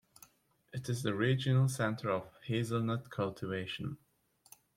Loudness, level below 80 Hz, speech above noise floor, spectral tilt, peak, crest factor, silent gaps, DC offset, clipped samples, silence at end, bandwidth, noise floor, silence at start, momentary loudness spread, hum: -35 LUFS; -70 dBFS; 34 dB; -6 dB/octave; -18 dBFS; 18 dB; none; under 0.1%; under 0.1%; 0.8 s; 15.5 kHz; -68 dBFS; 0.75 s; 13 LU; none